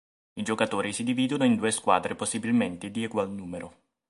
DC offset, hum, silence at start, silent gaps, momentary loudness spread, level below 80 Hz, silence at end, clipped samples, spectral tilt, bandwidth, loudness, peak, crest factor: under 0.1%; none; 0.35 s; none; 14 LU; -62 dBFS; 0.4 s; under 0.1%; -4.5 dB/octave; 11.5 kHz; -27 LUFS; -6 dBFS; 22 dB